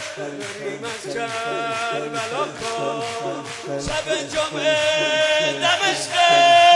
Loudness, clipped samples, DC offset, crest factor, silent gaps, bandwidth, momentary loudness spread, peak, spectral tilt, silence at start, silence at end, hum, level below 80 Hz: -20 LUFS; under 0.1%; under 0.1%; 16 dB; none; 11.5 kHz; 13 LU; -4 dBFS; -2 dB/octave; 0 s; 0 s; none; -52 dBFS